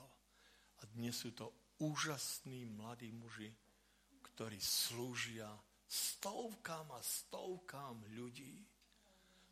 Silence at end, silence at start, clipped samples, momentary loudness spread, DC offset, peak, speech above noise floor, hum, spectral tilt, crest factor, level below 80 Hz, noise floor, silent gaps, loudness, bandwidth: 0.05 s; 0 s; under 0.1%; 16 LU; under 0.1%; -22 dBFS; 27 dB; 50 Hz at -80 dBFS; -2.5 dB/octave; 26 dB; -80 dBFS; -73 dBFS; none; -45 LUFS; 15.5 kHz